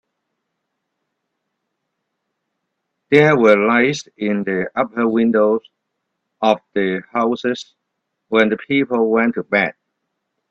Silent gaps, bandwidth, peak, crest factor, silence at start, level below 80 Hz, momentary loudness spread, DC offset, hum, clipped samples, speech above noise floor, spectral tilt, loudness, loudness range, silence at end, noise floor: none; 7.8 kHz; 0 dBFS; 18 dB; 3.1 s; -62 dBFS; 9 LU; under 0.1%; none; under 0.1%; 60 dB; -6 dB/octave; -17 LUFS; 5 LU; 0.8 s; -76 dBFS